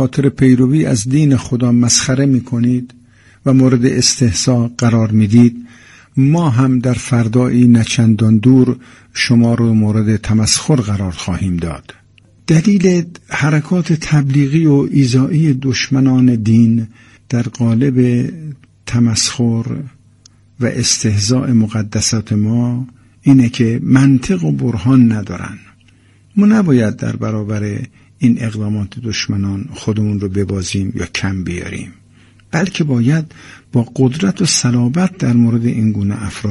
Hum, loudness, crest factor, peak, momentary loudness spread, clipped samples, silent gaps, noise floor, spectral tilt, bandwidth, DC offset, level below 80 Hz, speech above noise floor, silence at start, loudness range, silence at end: none; -14 LUFS; 14 dB; 0 dBFS; 10 LU; under 0.1%; none; -48 dBFS; -5.5 dB/octave; 11.5 kHz; under 0.1%; -42 dBFS; 35 dB; 0 s; 6 LU; 0 s